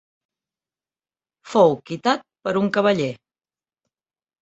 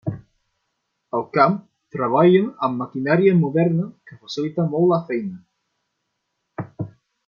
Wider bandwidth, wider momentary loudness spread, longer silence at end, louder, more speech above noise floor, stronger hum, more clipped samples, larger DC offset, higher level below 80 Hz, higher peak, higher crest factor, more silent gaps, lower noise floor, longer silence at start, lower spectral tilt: first, 8.2 kHz vs 7 kHz; second, 8 LU vs 18 LU; first, 1.25 s vs 0.4 s; about the same, -21 LUFS vs -20 LUFS; first, over 71 dB vs 57 dB; neither; neither; neither; about the same, -66 dBFS vs -64 dBFS; about the same, -2 dBFS vs -2 dBFS; about the same, 22 dB vs 20 dB; neither; first, under -90 dBFS vs -76 dBFS; first, 1.45 s vs 0.05 s; second, -6 dB/octave vs -8.5 dB/octave